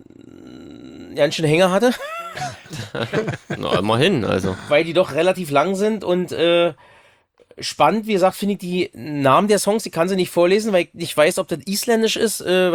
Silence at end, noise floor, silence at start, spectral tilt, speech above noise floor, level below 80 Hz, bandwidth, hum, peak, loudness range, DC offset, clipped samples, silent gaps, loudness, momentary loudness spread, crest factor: 0 s; -55 dBFS; 0.4 s; -4.5 dB/octave; 36 dB; -58 dBFS; over 20 kHz; none; -2 dBFS; 3 LU; under 0.1%; under 0.1%; none; -19 LUFS; 12 LU; 16 dB